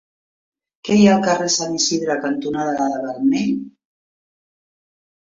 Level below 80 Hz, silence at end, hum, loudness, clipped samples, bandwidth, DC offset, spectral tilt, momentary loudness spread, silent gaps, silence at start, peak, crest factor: -60 dBFS; 1.65 s; none; -18 LUFS; under 0.1%; 7.8 kHz; under 0.1%; -4 dB/octave; 9 LU; none; 0.85 s; -2 dBFS; 18 dB